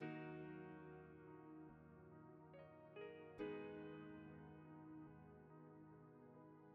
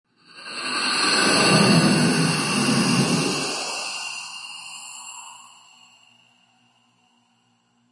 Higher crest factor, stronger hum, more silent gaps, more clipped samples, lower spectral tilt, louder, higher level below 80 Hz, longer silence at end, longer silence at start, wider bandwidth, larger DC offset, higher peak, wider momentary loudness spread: about the same, 20 dB vs 18 dB; neither; neither; neither; first, -6.5 dB/octave vs -3.5 dB/octave; second, -58 LUFS vs -20 LUFS; second, -82 dBFS vs -62 dBFS; second, 0 s vs 2.55 s; second, 0 s vs 0.35 s; second, 4.9 kHz vs 11.5 kHz; neither; second, -38 dBFS vs -4 dBFS; second, 12 LU vs 20 LU